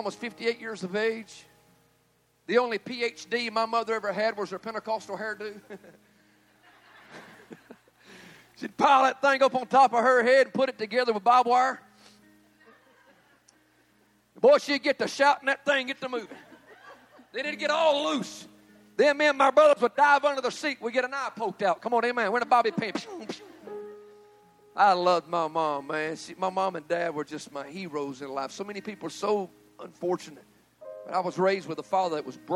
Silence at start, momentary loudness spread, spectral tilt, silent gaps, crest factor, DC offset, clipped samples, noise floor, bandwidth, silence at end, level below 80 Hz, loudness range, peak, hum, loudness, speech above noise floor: 0 s; 19 LU; -4 dB/octave; none; 20 dB; under 0.1%; under 0.1%; -67 dBFS; 13.5 kHz; 0 s; -78 dBFS; 10 LU; -6 dBFS; none; -26 LUFS; 42 dB